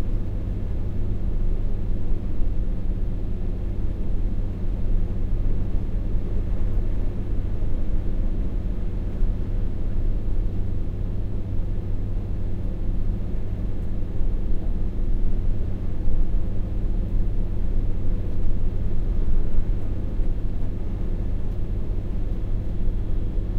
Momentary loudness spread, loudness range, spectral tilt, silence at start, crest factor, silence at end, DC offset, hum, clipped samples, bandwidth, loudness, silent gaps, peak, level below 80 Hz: 2 LU; 1 LU; -9.5 dB/octave; 0 s; 14 dB; 0 s; under 0.1%; none; under 0.1%; 2.8 kHz; -30 LUFS; none; -6 dBFS; -22 dBFS